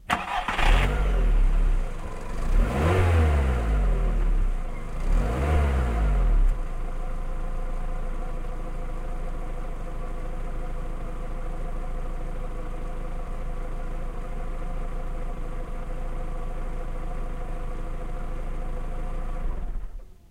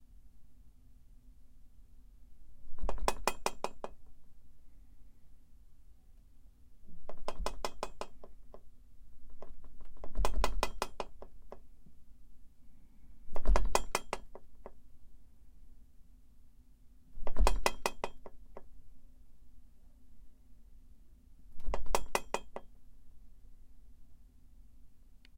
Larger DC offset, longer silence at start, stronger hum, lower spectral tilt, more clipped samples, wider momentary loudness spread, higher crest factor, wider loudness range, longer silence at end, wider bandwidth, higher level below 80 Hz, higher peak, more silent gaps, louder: neither; about the same, 0 s vs 0 s; neither; first, -6.5 dB/octave vs -3.5 dB/octave; neither; second, 13 LU vs 25 LU; about the same, 18 dB vs 22 dB; about the same, 11 LU vs 12 LU; first, 0.15 s vs 0 s; second, 10.5 kHz vs 16 kHz; first, -26 dBFS vs -42 dBFS; first, -6 dBFS vs -10 dBFS; neither; first, -30 LUFS vs -38 LUFS